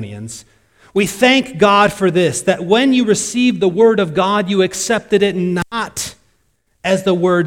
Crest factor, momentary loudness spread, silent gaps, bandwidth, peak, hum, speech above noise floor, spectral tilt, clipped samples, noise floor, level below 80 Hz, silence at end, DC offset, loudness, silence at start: 16 dB; 11 LU; none; 16.5 kHz; 0 dBFS; none; 48 dB; -4.5 dB/octave; under 0.1%; -62 dBFS; -50 dBFS; 0 s; under 0.1%; -14 LUFS; 0 s